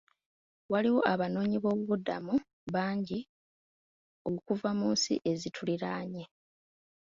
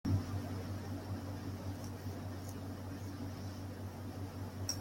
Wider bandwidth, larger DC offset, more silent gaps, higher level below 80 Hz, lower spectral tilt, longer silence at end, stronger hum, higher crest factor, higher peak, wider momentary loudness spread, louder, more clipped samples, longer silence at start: second, 7.8 kHz vs 16.5 kHz; neither; first, 2.53-2.67 s, 3.29-4.25 s vs none; second, -70 dBFS vs -62 dBFS; about the same, -5 dB/octave vs -5.5 dB/octave; first, 0.75 s vs 0 s; neither; about the same, 22 dB vs 18 dB; first, -12 dBFS vs -24 dBFS; first, 10 LU vs 5 LU; first, -32 LUFS vs -44 LUFS; neither; first, 0.7 s vs 0.05 s